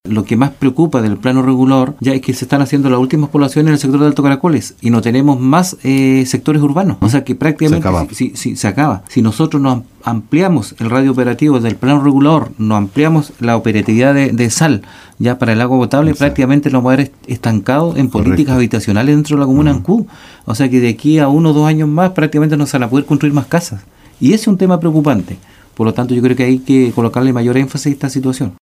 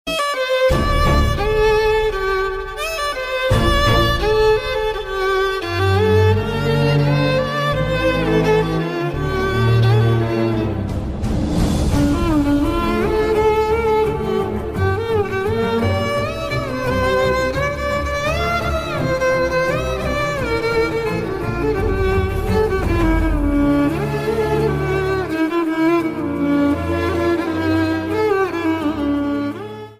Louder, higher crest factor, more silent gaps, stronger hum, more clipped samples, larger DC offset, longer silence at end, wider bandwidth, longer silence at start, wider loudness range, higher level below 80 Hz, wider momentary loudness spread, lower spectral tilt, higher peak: first, -12 LUFS vs -18 LUFS; about the same, 12 dB vs 14 dB; neither; neither; neither; neither; about the same, 0.1 s vs 0.05 s; about the same, 15 kHz vs 16 kHz; about the same, 0.05 s vs 0.05 s; about the same, 2 LU vs 2 LU; second, -40 dBFS vs -28 dBFS; about the same, 6 LU vs 6 LU; about the same, -6.5 dB/octave vs -6.5 dB/octave; first, 0 dBFS vs -4 dBFS